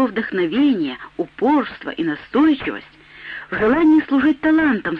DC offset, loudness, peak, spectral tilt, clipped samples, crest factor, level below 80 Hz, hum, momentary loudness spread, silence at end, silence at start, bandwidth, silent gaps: under 0.1%; -18 LUFS; -6 dBFS; -7.5 dB/octave; under 0.1%; 12 dB; -50 dBFS; none; 14 LU; 0 s; 0 s; 5 kHz; none